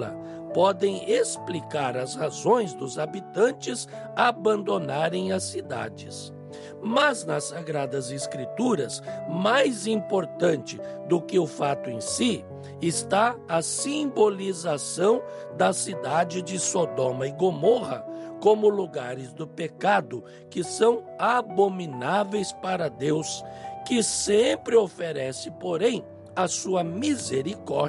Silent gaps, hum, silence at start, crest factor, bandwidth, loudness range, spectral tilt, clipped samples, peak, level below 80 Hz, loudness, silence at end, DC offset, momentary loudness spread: none; none; 0 s; 18 dB; 11.5 kHz; 2 LU; -4 dB/octave; under 0.1%; -8 dBFS; -68 dBFS; -26 LUFS; 0 s; under 0.1%; 12 LU